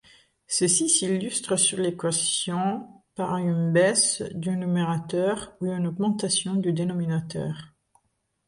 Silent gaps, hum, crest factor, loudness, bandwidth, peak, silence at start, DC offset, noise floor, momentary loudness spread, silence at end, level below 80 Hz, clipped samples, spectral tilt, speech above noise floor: none; none; 18 dB; -24 LUFS; 11.5 kHz; -8 dBFS; 0.5 s; under 0.1%; -73 dBFS; 10 LU; 0.8 s; -64 dBFS; under 0.1%; -4 dB/octave; 48 dB